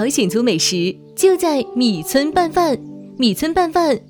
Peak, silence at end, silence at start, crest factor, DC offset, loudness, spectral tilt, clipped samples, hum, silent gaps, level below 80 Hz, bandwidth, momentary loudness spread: -2 dBFS; 0.1 s; 0 s; 14 dB; under 0.1%; -17 LUFS; -4 dB/octave; under 0.1%; none; none; -48 dBFS; over 20 kHz; 5 LU